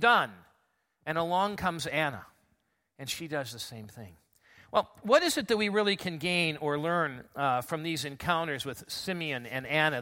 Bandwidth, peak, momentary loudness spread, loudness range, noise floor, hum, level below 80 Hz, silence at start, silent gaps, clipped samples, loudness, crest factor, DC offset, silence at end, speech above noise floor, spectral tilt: 16.5 kHz; -8 dBFS; 12 LU; 7 LU; -75 dBFS; none; -64 dBFS; 0 s; none; under 0.1%; -30 LUFS; 22 dB; under 0.1%; 0 s; 45 dB; -4 dB/octave